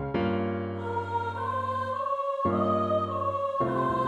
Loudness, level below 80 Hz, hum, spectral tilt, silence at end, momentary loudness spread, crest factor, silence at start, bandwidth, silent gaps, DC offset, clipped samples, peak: -29 LUFS; -56 dBFS; none; -8 dB/octave; 0 s; 5 LU; 14 dB; 0 s; 10.5 kHz; none; under 0.1%; under 0.1%; -14 dBFS